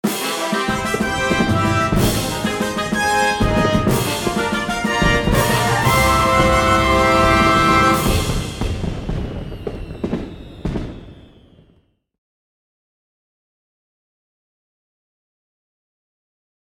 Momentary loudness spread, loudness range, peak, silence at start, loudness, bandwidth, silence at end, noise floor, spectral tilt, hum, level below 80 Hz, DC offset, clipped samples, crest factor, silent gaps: 14 LU; 16 LU; -2 dBFS; 0.05 s; -17 LUFS; 19 kHz; 5.55 s; -58 dBFS; -4.5 dB/octave; none; -30 dBFS; under 0.1%; under 0.1%; 18 dB; none